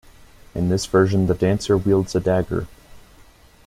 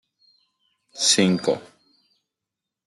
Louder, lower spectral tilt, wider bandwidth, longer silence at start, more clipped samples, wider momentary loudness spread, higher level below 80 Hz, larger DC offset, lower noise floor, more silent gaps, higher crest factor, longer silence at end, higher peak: about the same, -20 LUFS vs -20 LUFS; first, -6.5 dB/octave vs -3 dB/octave; first, 14.5 kHz vs 12 kHz; second, 0.55 s vs 0.95 s; neither; second, 10 LU vs 14 LU; first, -42 dBFS vs -70 dBFS; neither; second, -49 dBFS vs -86 dBFS; neither; second, 16 dB vs 22 dB; second, 0.65 s vs 1.25 s; about the same, -4 dBFS vs -4 dBFS